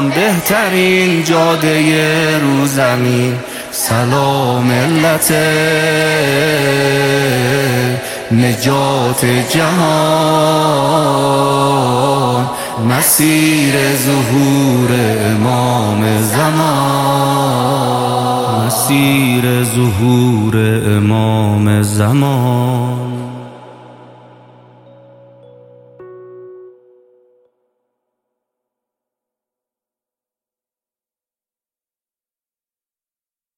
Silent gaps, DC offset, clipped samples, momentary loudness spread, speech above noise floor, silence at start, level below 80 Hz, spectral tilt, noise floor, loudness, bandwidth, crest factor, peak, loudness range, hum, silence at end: none; under 0.1%; under 0.1%; 4 LU; over 78 dB; 0 s; -50 dBFS; -5 dB/octave; under -90 dBFS; -12 LUFS; 17 kHz; 14 dB; 0 dBFS; 2 LU; none; 6.9 s